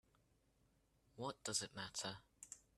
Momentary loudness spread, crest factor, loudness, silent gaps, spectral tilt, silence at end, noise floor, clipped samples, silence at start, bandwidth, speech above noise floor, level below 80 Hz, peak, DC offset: 14 LU; 24 dB; -46 LUFS; none; -2 dB/octave; 0.2 s; -78 dBFS; under 0.1%; 1.15 s; 13 kHz; 31 dB; -78 dBFS; -26 dBFS; under 0.1%